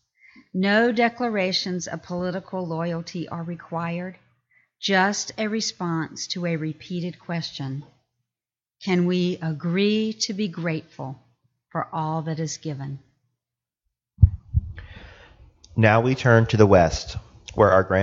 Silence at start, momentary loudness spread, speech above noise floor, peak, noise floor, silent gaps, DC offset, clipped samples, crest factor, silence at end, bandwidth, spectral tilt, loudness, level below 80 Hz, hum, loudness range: 0.55 s; 16 LU; over 67 dB; 0 dBFS; under -90 dBFS; none; under 0.1%; under 0.1%; 24 dB; 0 s; 7.8 kHz; -5.5 dB/octave; -23 LUFS; -40 dBFS; none; 10 LU